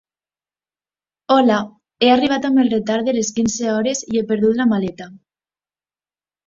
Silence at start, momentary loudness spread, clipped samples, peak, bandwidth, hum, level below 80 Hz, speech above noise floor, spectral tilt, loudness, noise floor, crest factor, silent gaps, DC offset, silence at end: 1.3 s; 7 LU; under 0.1%; -2 dBFS; 7.8 kHz; 50 Hz at -50 dBFS; -56 dBFS; over 73 dB; -4.5 dB/octave; -17 LUFS; under -90 dBFS; 18 dB; none; under 0.1%; 1.3 s